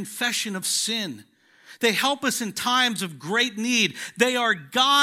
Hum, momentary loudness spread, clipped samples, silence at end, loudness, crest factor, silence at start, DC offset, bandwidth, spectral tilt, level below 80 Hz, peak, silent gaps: none; 5 LU; under 0.1%; 0 s; -23 LUFS; 20 dB; 0 s; under 0.1%; 16 kHz; -2 dB/octave; -76 dBFS; -4 dBFS; none